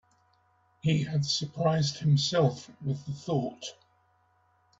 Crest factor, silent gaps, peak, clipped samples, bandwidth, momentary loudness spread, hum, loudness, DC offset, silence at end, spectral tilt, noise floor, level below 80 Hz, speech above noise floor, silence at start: 18 dB; none; -12 dBFS; under 0.1%; 7.8 kHz; 11 LU; none; -29 LUFS; under 0.1%; 1.1 s; -5.5 dB/octave; -68 dBFS; -64 dBFS; 40 dB; 0.85 s